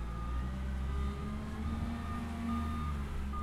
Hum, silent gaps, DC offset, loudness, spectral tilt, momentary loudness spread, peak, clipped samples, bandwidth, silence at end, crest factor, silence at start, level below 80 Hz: none; none; under 0.1%; -39 LUFS; -7 dB/octave; 3 LU; -24 dBFS; under 0.1%; 12.5 kHz; 0 s; 12 dB; 0 s; -38 dBFS